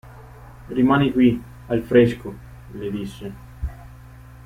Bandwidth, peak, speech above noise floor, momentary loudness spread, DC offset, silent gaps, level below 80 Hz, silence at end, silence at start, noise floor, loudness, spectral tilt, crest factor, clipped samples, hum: 15 kHz; -2 dBFS; 23 dB; 20 LU; under 0.1%; none; -42 dBFS; 0.5 s; 0.05 s; -42 dBFS; -20 LUFS; -8 dB/octave; 20 dB; under 0.1%; none